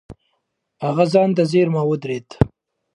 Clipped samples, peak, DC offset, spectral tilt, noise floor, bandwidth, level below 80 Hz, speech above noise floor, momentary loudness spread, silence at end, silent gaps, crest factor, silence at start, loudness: under 0.1%; 0 dBFS; under 0.1%; -7.5 dB/octave; -73 dBFS; 11 kHz; -42 dBFS; 55 dB; 9 LU; 0.5 s; none; 20 dB; 0.1 s; -19 LUFS